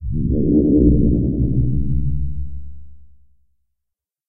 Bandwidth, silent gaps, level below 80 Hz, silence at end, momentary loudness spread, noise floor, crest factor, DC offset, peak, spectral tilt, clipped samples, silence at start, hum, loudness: 0.8 kHz; none; -24 dBFS; 0 s; 16 LU; -81 dBFS; 16 dB; under 0.1%; -2 dBFS; -19 dB/octave; under 0.1%; 0 s; none; -18 LUFS